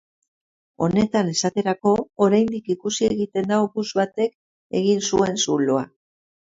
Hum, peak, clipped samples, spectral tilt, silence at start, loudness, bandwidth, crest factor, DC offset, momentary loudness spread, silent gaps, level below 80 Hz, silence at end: none; -4 dBFS; under 0.1%; -5 dB/octave; 0.8 s; -21 LUFS; 7.8 kHz; 18 dB; under 0.1%; 6 LU; 4.35-4.70 s; -56 dBFS; 0.7 s